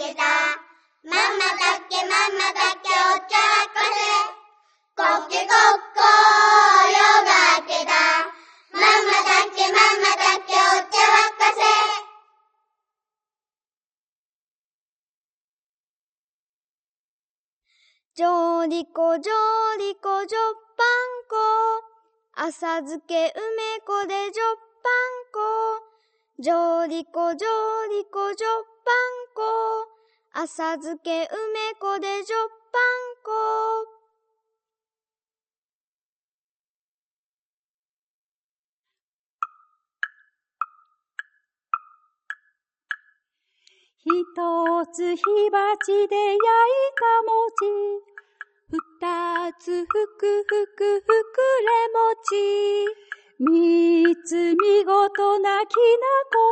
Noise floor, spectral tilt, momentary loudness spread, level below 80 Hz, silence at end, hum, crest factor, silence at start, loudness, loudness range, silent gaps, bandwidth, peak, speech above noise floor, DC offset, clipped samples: under -90 dBFS; 0 dB/octave; 16 LU; -78 dBFS; 0 s; none; 22 dB; 0 s; -20 LUFS; 16 LU; 13.77-17.62 s, 18.05-18.11 s, 35.58-38.83 s, 39.02-39.39 s; 8.8 kHz; 0 dBFS; over 68 dB; under 0.1%; under 0.1%